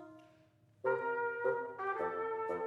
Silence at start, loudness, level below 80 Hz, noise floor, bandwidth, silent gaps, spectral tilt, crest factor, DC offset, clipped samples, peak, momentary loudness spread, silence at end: 0 s; -37 LUFS; -84 dBFS; -67 dBFS; 5.8 kHz; none; -7 dB/octave; 18 dB; under 0.1%; under 0.1%; -22 dBFS; 4 LU; 0 s